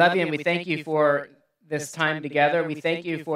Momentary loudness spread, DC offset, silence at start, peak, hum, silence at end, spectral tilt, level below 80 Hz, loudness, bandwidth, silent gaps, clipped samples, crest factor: 10 LU; under 0.1%; 0 s; -4 dBFS; none; 0 s; -5 dB/octave; -78 dBFS; -24 LUFS; 14.5 kHz; none; under 0.1%; 20 dB